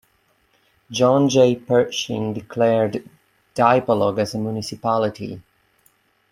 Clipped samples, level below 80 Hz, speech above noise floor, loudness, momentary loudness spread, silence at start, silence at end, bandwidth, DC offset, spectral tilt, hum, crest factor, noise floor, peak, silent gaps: under 0.1%; -60 dBFS; 44 dB; -19 LUFS; 15 LU; 0.9 s; 0.9 s; 14.5 kHz; under 0.1%; -5.5 dB/octave; none; 18 dB; -63 dBFS; -2 dBFS; none